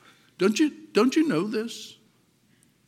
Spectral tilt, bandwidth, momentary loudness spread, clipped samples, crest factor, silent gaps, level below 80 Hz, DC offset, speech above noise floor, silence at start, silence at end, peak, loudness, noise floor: -5 dB/octave; 14.5 kHz; 15 LU; under 0.1%; 18 dB; none; -82 dBFS; under 0.1%; 40 dB; 0.4 s; 0.95 s; -8 dBFS; -25 LUFS; -64 dBFS